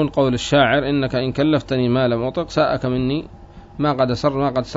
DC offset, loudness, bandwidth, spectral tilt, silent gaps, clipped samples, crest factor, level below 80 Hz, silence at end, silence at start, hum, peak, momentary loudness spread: under 0.1%; -19 LUFS; 8 kHz; -6.5 dB/octave; none; under 0.1%; 18 dB; -42 dBFS; 0 s; 0 s; none; -2 dBFS; 7 LU